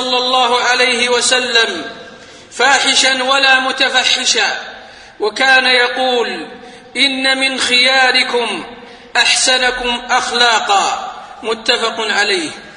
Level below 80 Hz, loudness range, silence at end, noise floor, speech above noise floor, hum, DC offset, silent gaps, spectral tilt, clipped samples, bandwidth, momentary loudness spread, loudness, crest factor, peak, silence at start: -52 dBFS; 2 LU; 0 s; -36 dBFS; 23 dB; none; under 0.1%; none; 0.5 dB/octave; under 0.1%; 11 kHz; 14 LU; -12 LUFS; 14 dB; 0 dBFS; 0 s